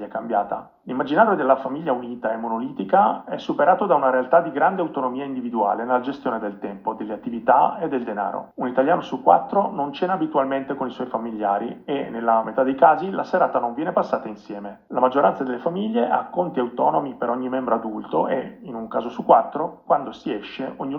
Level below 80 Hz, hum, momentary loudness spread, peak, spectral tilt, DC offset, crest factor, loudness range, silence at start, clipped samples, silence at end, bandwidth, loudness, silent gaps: -66 dBFS; none; 11 LU; 0 dBFS; -8 dB/octave; under 0.1%; 22 dB; 3 LU; 0 s; under 0.1%; 0 s; 6.4 kHz; -22 LUFS; none